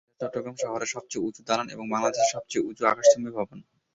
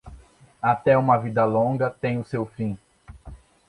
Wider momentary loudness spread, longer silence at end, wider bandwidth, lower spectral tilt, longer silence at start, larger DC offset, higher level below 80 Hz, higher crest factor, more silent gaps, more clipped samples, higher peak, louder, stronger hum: about the same, 12 LU vs 12 LU; about the same, 0.3 s vs 0.35 s; second, 8 kHz vs 11 kHz; second, -3 dB/octave vs -9 dB/octave; first, 0.2 s vs 0.05 s; neither; second, -68 dBFS vs -50 dBFS; about the same, 22 dB vs 18 dB; neither; neither; about the same, -6 dBFS vs -6 dBFS; second, -27 LUFS vs -23 LUFS; neither